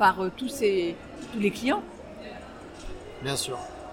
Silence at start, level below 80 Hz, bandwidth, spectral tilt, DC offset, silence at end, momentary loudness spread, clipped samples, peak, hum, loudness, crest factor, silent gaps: 0 s; -52 dBFS; 17 kHz; -4 dB/octave; under 0.1%; 0 s; 17 LU; under 0.1%; -8 dBFS; none; -29 LUFS; 20 dB; none